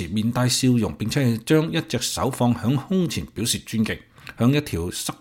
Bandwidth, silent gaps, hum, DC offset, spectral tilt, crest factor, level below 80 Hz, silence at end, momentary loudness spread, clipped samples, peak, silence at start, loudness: 17 kHz; none; none; under 0.1%; -5 dB/octave; 16 dB; -48 dBFS; 0.05 s; 7 LU; under 0.1%; -6 dBFS; 0 s; -22 LUFS